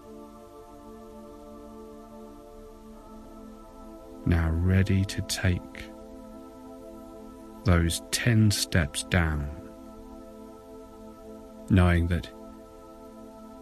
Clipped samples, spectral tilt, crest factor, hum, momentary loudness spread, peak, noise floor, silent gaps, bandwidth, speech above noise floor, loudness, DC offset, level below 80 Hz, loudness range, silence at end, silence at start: under 0.1%; -5.5 dB/octave; 22 dB; none; 24 LU; -8 dBFS; -47 dBFS; none; 14 kHz; 23 dB; -26 LUFS; under 0.1%; -38 dBFS; 19 LU; 0 s; 0.05 s